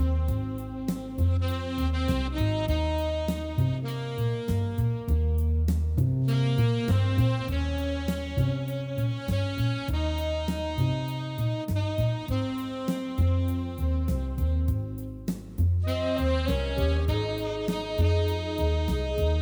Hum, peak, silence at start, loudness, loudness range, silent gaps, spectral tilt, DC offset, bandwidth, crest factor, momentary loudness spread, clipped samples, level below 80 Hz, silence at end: none; -12 dBFS; 0 s; -28 LUFS; 3 LU; none; -7.5 dB/octave; under 0.1%; over 20 kHz; 14 dB; 6 LU; under 0.1%; -32 dBFS; 0 s